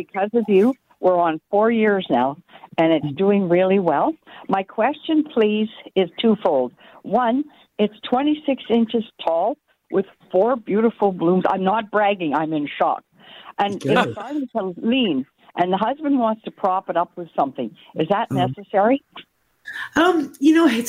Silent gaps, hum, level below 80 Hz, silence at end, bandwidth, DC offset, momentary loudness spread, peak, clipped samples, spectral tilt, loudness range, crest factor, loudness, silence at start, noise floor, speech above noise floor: none; none; -64 dBFS; 0 s; 15 kHz; under 0.1%; 8 LU; -4 dBFS; under 0.1%; -6.5 dB/octave; 3 LU; 16 dB; -20 LUFS; 0 s; -39 dBFS; 19 dB